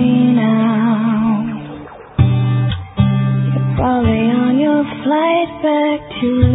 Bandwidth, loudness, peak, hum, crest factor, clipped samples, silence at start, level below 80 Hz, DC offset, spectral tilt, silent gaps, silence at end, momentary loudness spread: 4 kHz; -15 LUFS; 0 dBFS; none; 14 dB; under 0.1%; 0 s; -30 dBFS; under 0.1%; -13.5 dB/octave; none; 0 s; 6 LU